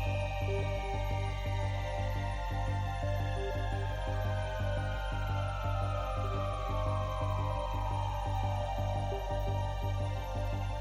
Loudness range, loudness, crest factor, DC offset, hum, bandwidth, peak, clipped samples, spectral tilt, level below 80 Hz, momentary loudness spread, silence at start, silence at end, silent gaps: 1 LU; -35 LUFS; 12 dB; under 0.1%; none; 13 kHz; -22 dBFS; under 0.1%; -6.5 dB/octave; -38 dBFS; 2 LU; 0 s; 0 s; none